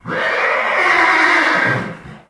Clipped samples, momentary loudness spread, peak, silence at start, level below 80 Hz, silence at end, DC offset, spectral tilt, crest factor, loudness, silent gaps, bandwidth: under 0.1%; 8 LU; 0 dBFS; 0.05 s; -54 dBFS; 0.1 s; under 0.1%; -4 dB/octave; 16 dB; -13 LUFS; none; 11 kHz